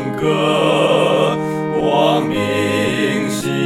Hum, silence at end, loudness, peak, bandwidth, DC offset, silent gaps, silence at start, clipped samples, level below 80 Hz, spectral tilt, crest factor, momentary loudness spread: none; 0 s; -16 LUFS; 0 dBFS; 16 kHz; 0.2%; none; 0 s; under 0.1%; -50 dBFS; -5.5 dB/octave; 16 dB; 5 LU